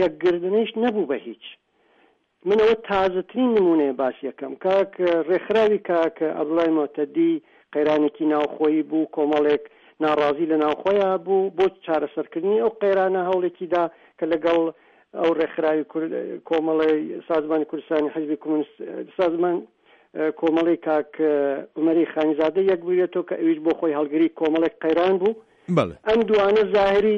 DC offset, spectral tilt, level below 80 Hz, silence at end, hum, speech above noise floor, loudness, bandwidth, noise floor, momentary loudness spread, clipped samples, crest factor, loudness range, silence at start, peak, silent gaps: under 0.1%; -7.5 dB/octave; -60 dBFS; 0 s; none; 40 dB; -22 LUFS; 6.8 kHz; -61 dBFS; 8 LU; under 0.1%; 14 dB; 3 LU; 0 s; -6 dBFS; none